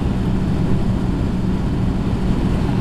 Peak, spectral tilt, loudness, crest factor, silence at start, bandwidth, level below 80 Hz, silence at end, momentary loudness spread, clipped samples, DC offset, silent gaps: -6 dBFS; -8.5 dB/octave; -20 LUFS; 12 dB; 0 s; 11.5 kHz; -24 dBFS; 0 s; 1 LU; under 0.1%; under 0.1%; none